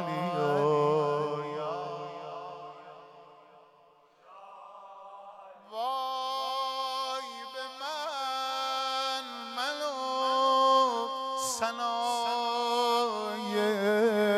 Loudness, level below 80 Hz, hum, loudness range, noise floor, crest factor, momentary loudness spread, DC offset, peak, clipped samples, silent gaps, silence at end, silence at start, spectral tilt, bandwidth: -30 LUFS; -84 dBFS; none; 16 LU; -61 dBFS; 18 dB; 22 LU; under 0.1%; -14 dBFS; under 0.1%; none; 0 s; 0 s; -3.5 dB/octave; 15.5 kHz